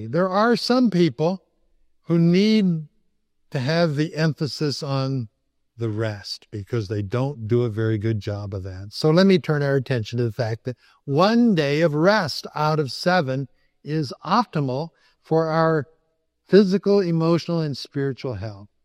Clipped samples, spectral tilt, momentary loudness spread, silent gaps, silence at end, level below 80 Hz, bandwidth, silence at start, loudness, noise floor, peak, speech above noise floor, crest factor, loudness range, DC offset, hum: under 0.1%; -7 dB/octave; 14 LU; none; 0.2 s; -62 dBFS; 13 kHz; 0 s; -22 LUFS; -70 dBFS; -2 dBFS; 49 dB; 20 dB; 5 LU; under 0.1%; none